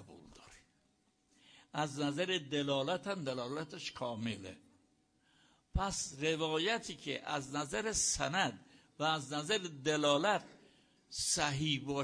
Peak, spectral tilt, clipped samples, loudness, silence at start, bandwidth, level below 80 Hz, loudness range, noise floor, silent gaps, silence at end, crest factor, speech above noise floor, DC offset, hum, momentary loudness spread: -16 dBFS; -3 dB/octave; under 0.1%; -36 LUFS; 0 s; 10.5 kHz; -56 dBFS; 6 LU; -75 dBFS; none; 0 s; 22 dB; 39 dB; under 0.1%; none; 10 LU